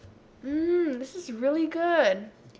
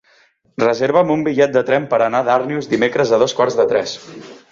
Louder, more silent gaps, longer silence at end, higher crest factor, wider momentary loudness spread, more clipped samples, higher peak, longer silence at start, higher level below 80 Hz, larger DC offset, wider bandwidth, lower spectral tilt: second, -27 LUFS vs -16 LUFS; neither; about the same, 0.1 s vs 0.15 s; about the same, 16 dB vs 16 dB; about the same, 12 LU vs 12 LU; neither; second, -10 dBFS vs -2 dBFS; second, 0.05 s vs 0.6 s; about the same, -62 dBFS vs -58 dBFS; neither; about the same, 8 kHz vs 7.6 kHz; about the same, -5 dB/octave vs -5 dB/octave